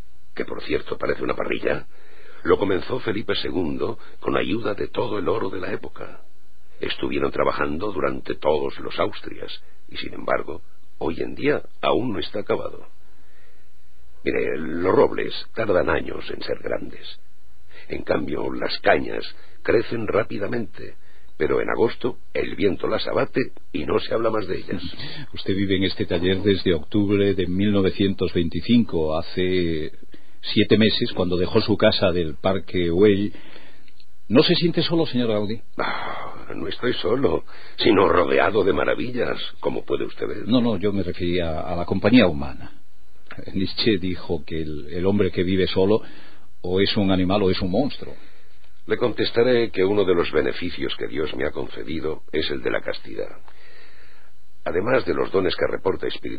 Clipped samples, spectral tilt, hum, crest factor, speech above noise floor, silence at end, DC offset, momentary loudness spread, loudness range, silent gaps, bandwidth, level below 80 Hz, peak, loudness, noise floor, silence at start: under 0.1%; -8 dB/octave; none; 20 dB; 36 dB; 0 s; 5%; 13 LU; 6 LU; none; 5 kHz; -46 dBFS; -2 dBFS; -23 LUFS; -59 dBFS; 0.35 s